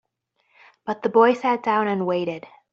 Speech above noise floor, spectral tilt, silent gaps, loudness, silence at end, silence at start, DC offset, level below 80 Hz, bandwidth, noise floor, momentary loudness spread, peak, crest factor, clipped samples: 50 dB; -4.5 dB/octave; none; -21 LUFS; 0.35 s; 0.85 s; under 0.1%; -70 dBFS; 7.4 kHz; -70 dBFS; 15 LU; -4 dBFS; 20 dB; under 0.1%